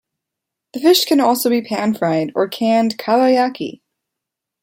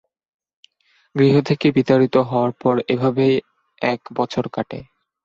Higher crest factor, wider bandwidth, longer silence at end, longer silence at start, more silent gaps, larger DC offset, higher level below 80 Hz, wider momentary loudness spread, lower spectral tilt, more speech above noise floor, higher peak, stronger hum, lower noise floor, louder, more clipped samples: about the same, 16 dB vs 18 dB; first, 16.5 kHz vs 7.6 kHz; first, 0.9 s vs 0.4 s; second, 0.75 s vs 1.15 s; neither; neither; second, -68 dBFS vs -58 dBFS; second, 8 LU vs 11 LU; second, -4 dB/octave vs -8 dB/octave; first, 66 dB vs 44 dB; about the same, -2 dBFS vs -2 dBFS; neither; first, -82 dBFS vs -62 dBFS; first, -16 LUFS vs -19 LUFS; neither